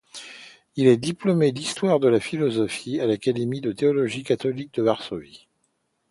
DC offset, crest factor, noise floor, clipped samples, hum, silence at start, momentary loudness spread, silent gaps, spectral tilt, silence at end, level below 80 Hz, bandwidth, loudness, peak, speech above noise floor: under 0.1%; 18 dB; -72 dBFS; under 0.1%; none; 0.15 s; 16 LU; none; -6 dB/octave; 0.75 s; -62 dBFS; 11.5 kHz; -23 LUFS; -4 dBFS; 49 dB